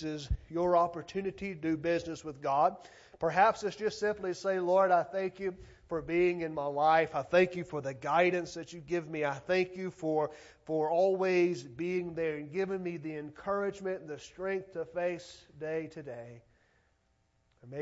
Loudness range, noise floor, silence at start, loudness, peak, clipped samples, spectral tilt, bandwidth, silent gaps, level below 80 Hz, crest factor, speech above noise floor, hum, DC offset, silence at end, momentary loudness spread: 7 LU; -73 dBFS; 0 s; -32 LUFS; -12 dBFS; under 0.1%; -6 dB/octave; 8 kHz; none; -54 dBFS; 20 dB; 41 dB; none; under 0.1%; 0 s; 13 LU